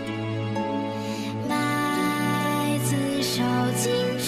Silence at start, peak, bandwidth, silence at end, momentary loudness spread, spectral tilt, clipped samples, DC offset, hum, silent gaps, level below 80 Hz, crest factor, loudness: 0 s; -12 dBFS; 14 kHz; 0 s; 6 LU; -4.5 dB/octave; under 0.1%; under 0.1%; none; none; -58 dBFS; 12 dB; -25 LUFS